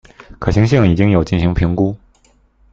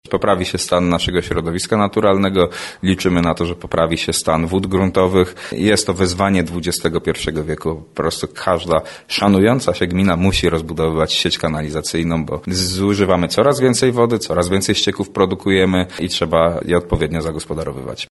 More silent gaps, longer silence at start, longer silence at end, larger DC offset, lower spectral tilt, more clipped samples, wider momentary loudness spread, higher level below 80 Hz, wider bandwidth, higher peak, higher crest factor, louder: neither; first, 0.3 s vs 0.1 s; first, 0.75 s vs 0.05 s; neither; first, -8 dB/octave vs -5 dB/octave; neither; about the same, 8 LU vs 7 LU; first, -30 dBFS vs -36 dBFS; second, 7.6 kHz vs 12 kHz; about the same, 0 dBFS vs 0 dBFS; about the same, 14 dB vs 16 dB; about the same, -15 LUFS vs -17 LUFS